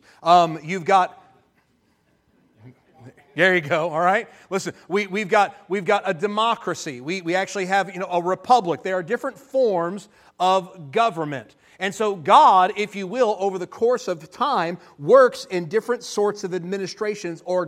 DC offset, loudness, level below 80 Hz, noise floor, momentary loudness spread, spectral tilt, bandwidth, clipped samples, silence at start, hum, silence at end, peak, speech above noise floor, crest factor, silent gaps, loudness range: under 0.1%; -21 LUFS; -72 dBFS; -64 dBFS; 12 LU; -4.5 dB/octave; 14 kHz; under 0.1%; 0.2 s; none; 0 s; -2 dBFS; 43 dB; 20 dB; none; 4 LU